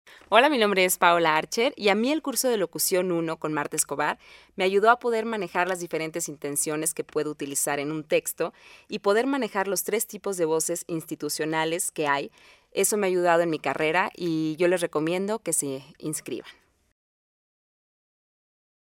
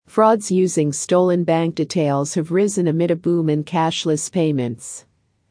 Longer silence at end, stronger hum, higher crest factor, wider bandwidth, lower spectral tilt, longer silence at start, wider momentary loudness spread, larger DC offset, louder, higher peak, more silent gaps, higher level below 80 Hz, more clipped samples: first, 2.4 s vs 0.5 s; neither; first, 24 dB vs 16 dB; first, 17 kHz vs 10.5 kHz; second, -3 dB/octave vs -5.5 dB/octave; about the same, 0.1 s vs 0.15 s; first, 11 LU vs 5 LU; neither; second, -25 LUFS vs -19 LUFS; about the same, -2 dBFS vs -2 dBFS; neither; second, -70 dBFS vs -64 dBFS; neither